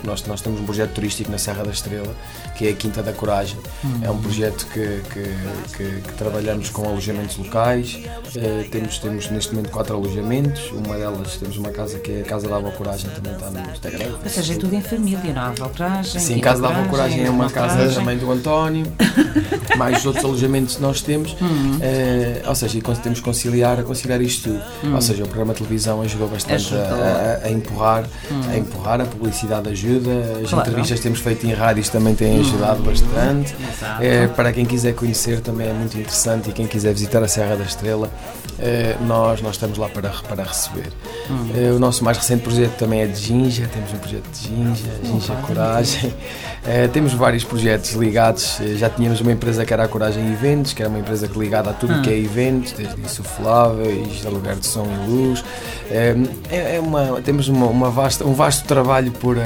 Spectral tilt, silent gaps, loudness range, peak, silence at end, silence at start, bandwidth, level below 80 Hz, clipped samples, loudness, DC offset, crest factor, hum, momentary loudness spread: -5 dB/octave; none; 6 LU; -2 dBFS; 0 s; 0 s; over 20 kHz; -32 dBFS; under 0.1%; -20 LUFS; under 0.1%; 18 dB; none; 10 LU